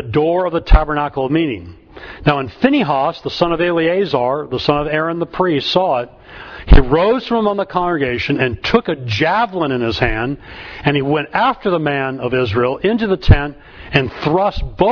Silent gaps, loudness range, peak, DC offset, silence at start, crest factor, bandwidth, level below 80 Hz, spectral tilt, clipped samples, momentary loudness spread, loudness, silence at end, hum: none; 1 LU; 0 dBFS; under 0.1%; 0 s; 16 dB; 5.4 kHz; -22 dBFS; -7.5 dB/octave; under 0.1%; 7 LU; -16 LUFS; 0 s; none